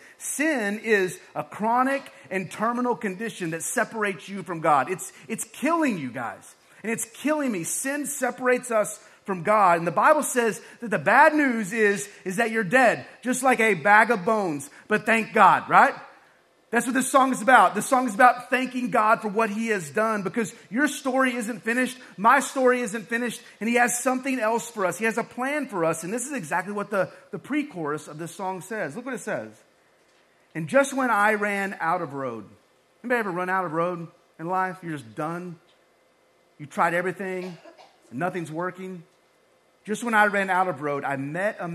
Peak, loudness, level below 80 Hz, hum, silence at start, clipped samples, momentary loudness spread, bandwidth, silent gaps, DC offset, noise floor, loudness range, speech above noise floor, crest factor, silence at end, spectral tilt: -2 dBFS; -24 LUFS; -76 dBFS; none; 0.2 s; under 0.1%; 15 LU; 14 kHz; none; under 0.1%; -62 dBFS; 10 LU; 38 dB; 24 dB; 0 s; -4 dB/octave